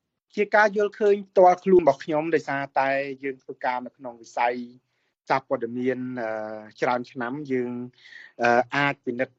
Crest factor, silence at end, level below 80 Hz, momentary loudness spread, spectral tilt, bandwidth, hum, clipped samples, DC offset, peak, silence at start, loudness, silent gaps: 20 dB; 0.15 s; -68 dBFS; 16 LU; -6 dB/octave; 7.8 kHz; none; under 0.1%; under 0.1%; -4 dBFS; 0.35 s; -24 LUFS; none